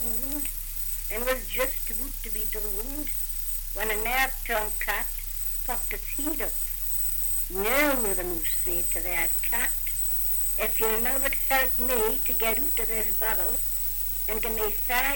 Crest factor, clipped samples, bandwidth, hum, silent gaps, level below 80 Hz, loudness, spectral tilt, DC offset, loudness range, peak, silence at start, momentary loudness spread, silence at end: 16 dB; under 0.1%; 17 kHz; none; none; -36 dBFS; -24 LUFS; -2 dB/octave; under 0.1%; 5 LU; -10 dBFS; 0 s; 6 LU; 0 s